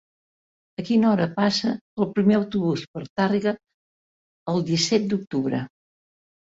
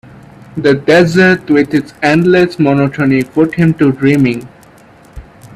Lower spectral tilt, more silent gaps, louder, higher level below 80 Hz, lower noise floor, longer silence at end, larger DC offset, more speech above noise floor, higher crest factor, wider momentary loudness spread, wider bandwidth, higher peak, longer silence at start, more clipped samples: second, -5.5 dB/octave vs -7 dB/octave; first, 1.81-1.97 s, 2.88-2.94 s, 3.10-3.16 s, 3.74-4.46 s vs none; second, -23 LUFS vs -11 LUFS; second, -62 dBFS vs -44 dBFS; first, under -90 dBFS vs -41 dBFS; first, 0.8 s vs 0.35 s; neither; first, over 68 dB vs 31 dB; about the same, 16 dB vs 12 dB; first, 13 LU vs 6 LU; second, 7.8 kHz vs 13.5 kHz; second, -8 dBFS vs 0 dBFS; first, 0.8 s vs 0.55 s; neither